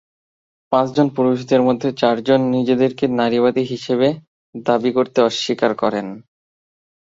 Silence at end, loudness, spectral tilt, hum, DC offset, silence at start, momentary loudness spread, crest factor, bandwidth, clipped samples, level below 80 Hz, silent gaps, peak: 0.85 s; -18 LUFS; -6 dB/octave; none; under 0.1%; 0.7 s; 6 LU; 16 dB; 7.8 kHz; under 0.1%; -60 dBFS; 4.27-4.53 s; -2 dBFS